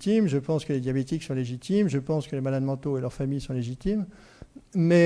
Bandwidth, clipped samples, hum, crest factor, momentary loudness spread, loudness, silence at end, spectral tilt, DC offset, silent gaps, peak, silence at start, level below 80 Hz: 11 kHz; under 0.1%; none; 16 dB; 7 LU; -28 LUFS; 0 s; -7.5 dB/octave; under 0.1%; none; -10 dBFS; 0 s; -50 dBFS